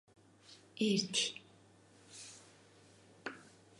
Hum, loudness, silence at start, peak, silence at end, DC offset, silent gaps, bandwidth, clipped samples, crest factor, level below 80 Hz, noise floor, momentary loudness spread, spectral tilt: none; -36 LUFS; 0.5 s; -20 dBFS; 0.4 s; under 0.1%; none; 11.5 kHz; under 0.1%; 22 dB; -84 dBFS; -64 dBFS; 24 LU; -3 dB/octave